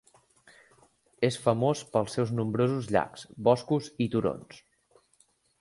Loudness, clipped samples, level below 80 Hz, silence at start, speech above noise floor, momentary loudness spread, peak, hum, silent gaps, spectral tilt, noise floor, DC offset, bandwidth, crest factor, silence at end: -28 LUFS; under 0.1%; -62 dBFS; 1.2 s; 40 dB; 5 LU; -8 dBFS; none; none; -6.5 dB/octave; -67 dBFS; under 0.1%; 11.5 kHz; 22 dB; 1.05 s